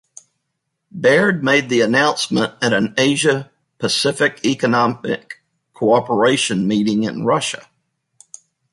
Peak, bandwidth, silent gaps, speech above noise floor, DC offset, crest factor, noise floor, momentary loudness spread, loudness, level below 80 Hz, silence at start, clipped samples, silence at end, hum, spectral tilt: -2 dBFS; 11.5 kHz; none; 58 dB; under 0.1%; 16 dB; -75 dBFS; 10 LU; -17 LUFS; -60 dBFS; 0.95 s; under 0.1%; 1.15 s; none; -4 dB/octave